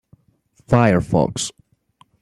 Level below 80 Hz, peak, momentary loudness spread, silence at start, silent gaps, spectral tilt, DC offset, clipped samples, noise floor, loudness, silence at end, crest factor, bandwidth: -46 dBFS; -2 dBFS; 11 LU; 0.7 s; none; -6 dB/octave; under 0.1%; under 0.1%; -59 dBFS; -18 LUFS; 0.7 s; 18 dB; 12.5 kHz